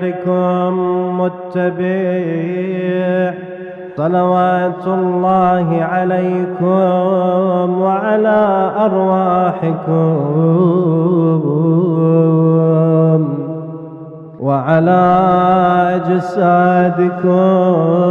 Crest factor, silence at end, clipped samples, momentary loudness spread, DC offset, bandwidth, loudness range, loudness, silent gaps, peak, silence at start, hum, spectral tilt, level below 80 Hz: 12 dB; 0 s; under 0.1%; 7 LU; under 0.1%; 4.1 kHz; 4 LU; -14 LUFS; none; 0 dBFS; 0 s; none; -10 dB/octave; -56 dBFS